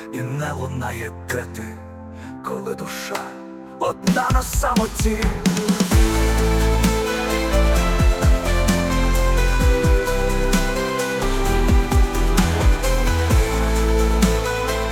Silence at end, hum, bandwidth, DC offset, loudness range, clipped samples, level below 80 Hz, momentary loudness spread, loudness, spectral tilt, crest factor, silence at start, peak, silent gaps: 0 s; none; 17 kHz; under 0.1%; 8 LU; under 0.1%; -22 dBFS; 10 LU; -20 LUFS; -5 dB/octave; 14 dB; 0 s; -4 dBFS; none